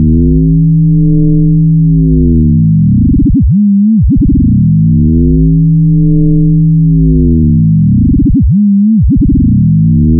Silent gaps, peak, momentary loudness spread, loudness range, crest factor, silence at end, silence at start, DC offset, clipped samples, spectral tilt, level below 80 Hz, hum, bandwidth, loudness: none; -4 dBFS; 1 LU; 0 LU; 4 dB; 0 s; 0 s; under 0.1%; under 0.1%; -23.5 dB/octave; -14 dBFS; none; 0.6 kHz; -8 LUFS